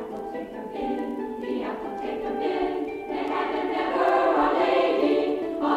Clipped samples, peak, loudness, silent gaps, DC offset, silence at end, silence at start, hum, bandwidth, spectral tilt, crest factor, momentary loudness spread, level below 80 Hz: under 0.1%; -8 dBFS; -26 LUFS; none; under 0.1%; 0 s; 0 s; none; 13 kHz; -5.5 dB/octave; 16 dB; 11 LU; -56 dBFS